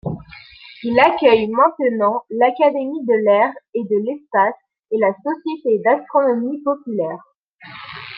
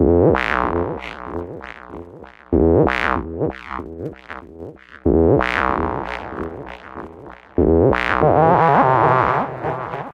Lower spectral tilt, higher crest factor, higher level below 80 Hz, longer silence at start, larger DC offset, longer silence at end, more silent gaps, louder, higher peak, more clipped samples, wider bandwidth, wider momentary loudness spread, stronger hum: about the same, -8 dB/octave vs -8.5 dB/octave; about the same, 18 dB vs 18 dB; second, -56 dBFS vs -34 dBFS; about the same, 0.05 s vs 0 s; neither; about the same, 0 s vs 0 s; first, 3.69-3.73 s, 4.79-4.83 s, 7.36-7.59 s vs none; about the same, -18 LUFS vs -17 LUFS; about the same, -2 dBFS vs 0 dBFS; neither; second, 5.4 kHz vs 8.4 kHz; second, 15 LU vs 21 LU; neither